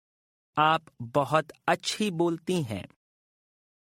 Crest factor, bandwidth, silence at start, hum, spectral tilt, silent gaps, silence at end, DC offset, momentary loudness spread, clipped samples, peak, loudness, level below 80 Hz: 20 dB; 16 kHz; 0.55 s; none; -5 dB/octave; none; 1.15 s; under 0.1%; 8 LU; under 0.1%; -8 dBFS; -28 LUFS; -68 dBFS